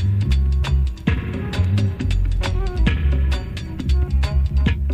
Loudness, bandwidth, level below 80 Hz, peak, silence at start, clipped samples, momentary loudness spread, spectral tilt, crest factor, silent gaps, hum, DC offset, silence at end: -21 LUFS; 8.8 kHz; -20 dBFS; -6 dBFS; 0 s; under 0.1%; 4 LU; -7 dB/octave; 12 dB; none; none; under 0.1%; 0 s